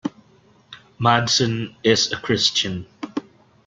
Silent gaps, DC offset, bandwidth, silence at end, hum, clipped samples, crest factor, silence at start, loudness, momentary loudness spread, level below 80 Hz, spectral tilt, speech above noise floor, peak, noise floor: none; under 0.1%; 9.4 kHz; 0.45 s; none; under 0.1%; 22 dB; 0.05 s; -19 LUFS; 14 LU; -56 dBFS; -3.5 dB/octave; 35 dB; -2 dBFS; -55 dBFS